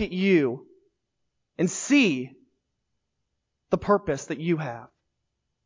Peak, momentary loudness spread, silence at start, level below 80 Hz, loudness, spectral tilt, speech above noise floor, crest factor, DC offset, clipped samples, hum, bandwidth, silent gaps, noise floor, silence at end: -8 dBFS; 19 LU; 0 s; -56 dBFS; -25 LUFS; -5 dB/octave; 55 dB; 20 dB; under 0.1%; under 0.1%; none; 7.6 kHz; none; -79 dBFS; 0.8 s